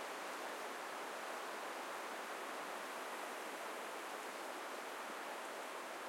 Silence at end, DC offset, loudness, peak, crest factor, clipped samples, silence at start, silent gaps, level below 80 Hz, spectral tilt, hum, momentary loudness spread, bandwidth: 0 s; under 0.1%; -46 LUFS; -34 dBFS; 14 dB; under 0.1%; 0 s; none; under -90 dBFS; -1 dB/octave; none; 1 LU; 16.5 kHz